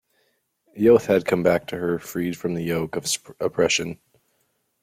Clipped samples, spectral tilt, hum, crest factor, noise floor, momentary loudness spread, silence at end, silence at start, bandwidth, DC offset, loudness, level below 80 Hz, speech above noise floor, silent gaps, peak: under 0.1%; -4.5 dB/octave; none; 20 dB; -70 dBFS; 10 LU; 0.85 s; 0.75 s; 16 kHz; under 0.1%; -22 LUFS; -58 dBFS; 48 dB; none; -4 dBFS